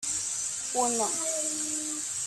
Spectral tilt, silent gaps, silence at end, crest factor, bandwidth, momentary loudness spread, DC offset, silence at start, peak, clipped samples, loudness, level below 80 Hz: -0.5 dB/octave; none; 0 s; 18 dB; 16 kHz; 4 LU; under 0.1%; 0 s; -14 dBFS; under 0.1%; -28 LUFS; -68 dBFS